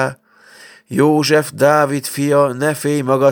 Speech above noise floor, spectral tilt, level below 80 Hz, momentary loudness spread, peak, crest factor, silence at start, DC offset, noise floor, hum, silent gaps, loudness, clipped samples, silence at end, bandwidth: 31 dB; -5.5 dB/octave; -64 dBFS; 6 LU; 0 dBFS; 16 dB; 0 s; under 0.1%; -45 dBFS; none; none; -15 LUFS; under 0.1%; 0 s; over 20 kHz